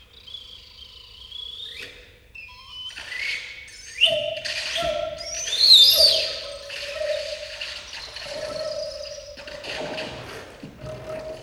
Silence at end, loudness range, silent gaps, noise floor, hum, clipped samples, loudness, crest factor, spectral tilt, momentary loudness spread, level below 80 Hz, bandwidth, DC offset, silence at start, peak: 0 s; 16 LU; none; -46 dBFS; none; under 0.1%; -20 LUFS; 24 dB; -0.5 dB/octave; 24 LU; -52 dBFS; over 20 kHz; under 0.1%; 0 s; -2 dBFS